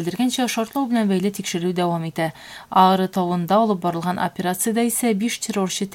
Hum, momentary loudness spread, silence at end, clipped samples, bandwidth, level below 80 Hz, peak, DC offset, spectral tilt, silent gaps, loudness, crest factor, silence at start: none; 7 LU; 0 s; under 0.1%; 17 kHz; -62 dBFS; -2 dBFS; under 0.1%; -4.5 dB/octave; none; -21 LUFS; 18 dB; 0 s